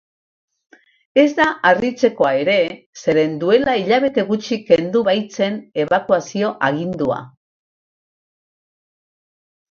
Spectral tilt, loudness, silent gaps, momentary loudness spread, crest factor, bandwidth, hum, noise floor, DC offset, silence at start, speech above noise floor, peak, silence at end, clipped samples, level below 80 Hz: -5.5 dB/octave; -17 LUFS; 2.86-2.93 s; 7 LU; 18 dB; 7.4 kHz; none; under -90 dBFS; under 0.1%; 1.15 s; over 73 dB; 0 dBFS; 2.45 s; under 0.1%; -58 dBFS